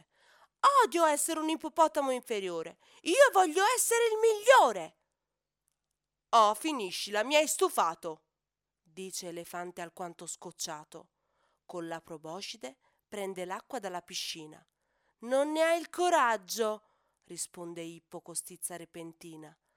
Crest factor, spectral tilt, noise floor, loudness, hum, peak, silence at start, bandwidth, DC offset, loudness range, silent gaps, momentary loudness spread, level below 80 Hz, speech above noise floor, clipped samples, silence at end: 22 dB; -2 dB/octave; -90 dBFS; -29 LUFS; none; -8 dBFS; 0.65 s; 20 kHz; under 0.1%; 15 LU; none; 21 LU; -84 dBFS; 59 dB; under 0.1%; 0.25 s